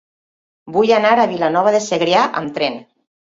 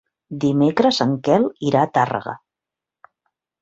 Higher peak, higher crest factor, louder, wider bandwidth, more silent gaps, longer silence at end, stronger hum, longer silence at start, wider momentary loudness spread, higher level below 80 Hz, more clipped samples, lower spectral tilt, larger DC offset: about the same, -2 dBFS vs -2 dBFS; about the same, 16 dB vs 18 dB; first, -16 LUFS vs -19 LUFS; about the same, 7.8 kHz vs 7.8 kHz; neither; second, 0.45 s vs 1.25 s; neither; first, 0.65 s vs 0.3 s; second, 9 LU vs 15 LU; about the same, -62 dBFS vs -60 dBFS; neither; second, -4 dB/octave vs -6.5 dB/octave; neither